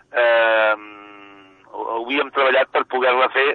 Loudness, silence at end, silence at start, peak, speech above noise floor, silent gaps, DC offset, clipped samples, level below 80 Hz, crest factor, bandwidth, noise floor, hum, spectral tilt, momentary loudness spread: -18 LUFS; 0 s; 0.15 s; -4 dBFS; 28 dB; none; under 0.1%; under 0.1%; -72 dBFS; 14 dB; 4.5 kHz; -46 dBFS; none; -5 dB/octave; 13 LU